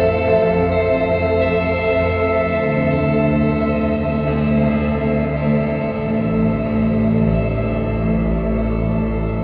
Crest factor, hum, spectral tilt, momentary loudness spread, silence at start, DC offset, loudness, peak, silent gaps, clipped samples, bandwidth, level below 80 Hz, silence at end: 12 dB; none; -11 dB/octave; 4 LU; 0 s; under 0.1%; -18 LUFS; -4 dBFS; none; under 0.1%; 5 kHz; -28 dBFS; 0 s